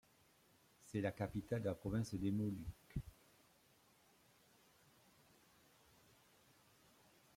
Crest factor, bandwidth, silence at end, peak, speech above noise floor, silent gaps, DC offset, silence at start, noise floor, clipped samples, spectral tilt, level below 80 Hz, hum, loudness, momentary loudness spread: 22 dB; 16.5 kHz; 4.25 s; -26 dBFS; 30 dB; none; under 0.1%; 0.85 s; -73 dBFS; under 0.1%; -7.5 dB/octave; -66 dBFS; none; -44 LUFS; 10 LU